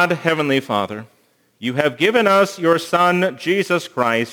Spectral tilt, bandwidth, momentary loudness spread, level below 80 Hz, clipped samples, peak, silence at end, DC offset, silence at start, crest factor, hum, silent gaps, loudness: -5 dB/octave; over 20 kHz; 8 LU; -70 dBFS; under 0.1%; 0 dBFS; 0 s; under 0.1%; 0 s; 18 dB; none; none; -18 LUFS